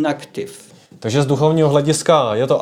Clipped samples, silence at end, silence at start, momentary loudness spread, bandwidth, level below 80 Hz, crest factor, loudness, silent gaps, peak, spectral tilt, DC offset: under 0.1%; 0 s; 0 s; 15 LU; 14.5 kHz; -54 dBFS; 14 dB; -16 LUFS; none; -2 dBFS; -5.5 dB/octave; under 0.1%